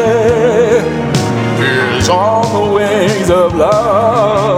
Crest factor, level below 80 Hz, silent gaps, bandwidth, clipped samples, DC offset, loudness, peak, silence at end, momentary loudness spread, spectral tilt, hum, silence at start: 10 dB; -36 dBFS; none; 16 kHz; under 0.1%; 0.2%; -11 LUFS; 0 dBFS; 0 s; 3 LU; -5.5 dB/octave; none; 0 s